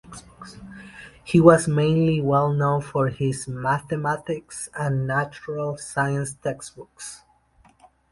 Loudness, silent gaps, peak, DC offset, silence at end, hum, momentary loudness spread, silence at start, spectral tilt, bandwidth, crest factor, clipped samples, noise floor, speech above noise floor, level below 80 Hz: -22 LUFS; none; 0 dBFS; under 0.1%; 0.95 s; none; 24 LU; 0.1 s; -6.5 dB/octave; 11.5 kHz; 22 dB; under 0.1%; -58 dBFS; 35 dB; -52 dBFS